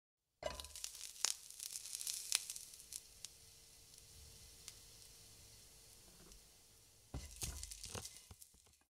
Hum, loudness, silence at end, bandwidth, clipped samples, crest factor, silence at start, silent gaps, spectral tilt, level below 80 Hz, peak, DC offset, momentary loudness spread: none; -45 LUFS; 0.1 s; 16 kHz; under 0.1%; 42 dB; 0.4 s; none; -0.5 dB/octave; -64 dBFS; -8 dBFS; under 0.1%; 20 LU